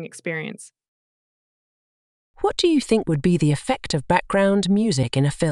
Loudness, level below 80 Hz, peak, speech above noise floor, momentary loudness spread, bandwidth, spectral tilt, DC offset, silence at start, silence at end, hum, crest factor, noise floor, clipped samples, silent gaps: -21 LUFS; -48 dBFS; -2 dBFS; over 70 dB; 10 LU; 12 kHz; -6 dB/octave; under 0.1%; 0 s; 0 s; none; 20 dB; under -90 dBFS; under 0.1%; 0.88-2.34 s